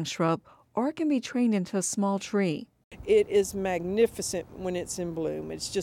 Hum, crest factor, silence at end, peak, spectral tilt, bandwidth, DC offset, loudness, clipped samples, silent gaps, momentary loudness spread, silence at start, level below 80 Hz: none; 16 dB; 0 s; -12 dBFS; -5 dB/octave; 16.5 kHz; under 0.1%; -28 LUFS; under 0.1%; 2.84-2.91 s; 8 LU; 0 s; -56 dBFS